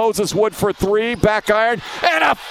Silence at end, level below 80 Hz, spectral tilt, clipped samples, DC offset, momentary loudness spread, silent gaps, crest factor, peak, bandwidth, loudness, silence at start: 0 s; -40 dBFS; -4 dB/octave; under 0.1%; under 0.1%; 4 LU; none; 18 dB; 0 dBFS; 16 kHz; -17 LUFS; 0 s